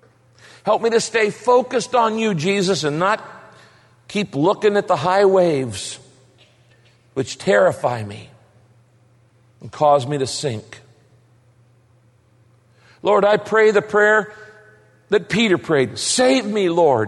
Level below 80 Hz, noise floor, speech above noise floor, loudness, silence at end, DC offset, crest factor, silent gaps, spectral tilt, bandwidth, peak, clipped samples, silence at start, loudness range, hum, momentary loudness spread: -62 dBFS; -55 dBFS; 38 dB; -18 LUFS; 0 s; under 0.1%; 16 dB; none; -4.5 dB/octave; 12 kHz; -4 dBFS; under 0.1%; 0.65 s; 6 LU; none; 13 LU